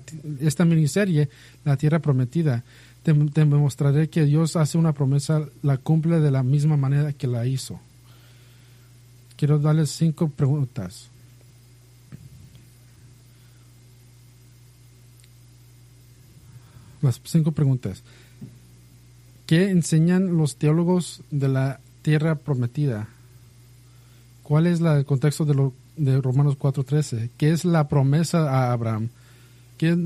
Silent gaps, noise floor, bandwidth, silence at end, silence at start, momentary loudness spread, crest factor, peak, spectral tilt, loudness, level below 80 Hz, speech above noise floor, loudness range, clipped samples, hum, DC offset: none; -51 dBFS; 13 kHz; 0 s; 0 s; 9 LU; 16 dB; -8 dBFS; -7.5 dB/octave; -22 LUFS; -58 dBFS; 30 dB; 6 LU; under 0.1%; none; under 0.1%